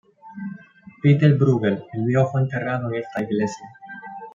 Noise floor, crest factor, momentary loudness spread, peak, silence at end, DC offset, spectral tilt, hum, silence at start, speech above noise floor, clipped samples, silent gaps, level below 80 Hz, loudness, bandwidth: -45 dBFS; 20 dB; 21 LU; -2 dBFS; 0.05 s; under 0.1%; -8.5 dB/octave; none; 0.25 s; 26 dB; under 0.1%; none; -64 dBFS; -21 LUFS; 7.4 kHz